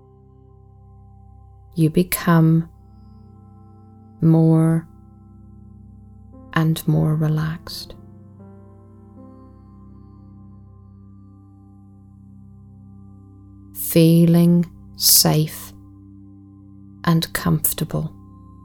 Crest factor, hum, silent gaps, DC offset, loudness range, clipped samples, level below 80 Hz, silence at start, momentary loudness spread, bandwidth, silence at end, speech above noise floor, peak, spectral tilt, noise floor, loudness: 22 dB; none; none; under 0.1%; 8 LU; under 0.1%; -48 dBFS; 1.75 s; 19 LU; over 20 kHz; 0.55 s; 31 dB; 0 dBFS; -5 dB/octave; -48 dBFS; -18 LUFS